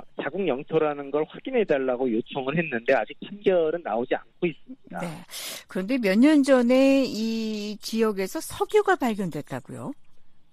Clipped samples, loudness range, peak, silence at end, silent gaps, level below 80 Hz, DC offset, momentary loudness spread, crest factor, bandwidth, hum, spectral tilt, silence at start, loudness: under 0.1%; 5 LU; -6 dBFS; 0.1 s; none; -60 dBFS; under 0.1%; 16 LU; 18 dB; 15 kHz; none; -5.5 dB/octave; 0 s; -25 LUFS